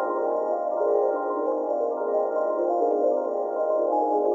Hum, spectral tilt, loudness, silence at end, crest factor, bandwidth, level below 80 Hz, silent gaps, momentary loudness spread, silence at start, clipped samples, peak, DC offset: none; -6 dB/octave; -25 LUFS; 0 s; 14 dB; 7.2 kHz; under -90 dBFS; none; 3 LU; 0 s; under 0.1%; -12 dBFS; under 0.1%